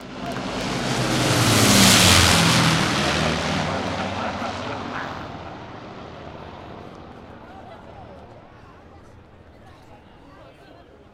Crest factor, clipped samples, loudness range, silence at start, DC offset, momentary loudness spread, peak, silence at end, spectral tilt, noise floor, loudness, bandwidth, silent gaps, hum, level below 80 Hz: 22 dB; under 0.1%; 24 LU; 0 s; under 0.1%; 28 LU; 0 dBFS; 0.65 s; -3 dB/octave; -47 dBFS; -18 LUFS; 16 kHz; none; none; -42 dBFS